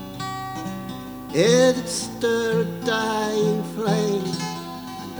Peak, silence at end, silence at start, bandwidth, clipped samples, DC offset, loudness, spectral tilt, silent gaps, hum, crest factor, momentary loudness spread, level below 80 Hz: -4 dBFS; 0 s; 0 s; over 20 kHz; under 0.1%; under 0.1%; -23 LUFS; -4.5 dB/octave; none; none; 18 dB; 15 LU; -54 dBFS